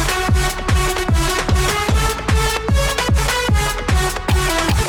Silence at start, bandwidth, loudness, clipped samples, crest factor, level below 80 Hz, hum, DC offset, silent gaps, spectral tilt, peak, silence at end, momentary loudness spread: 0 s; 19 kHz; -17 LUFS; under 0.1%; 14 dB; -20 dBFS; none; 0.4%; none; -4 dB/octave; -4 dBFS; 0 s; 1 LU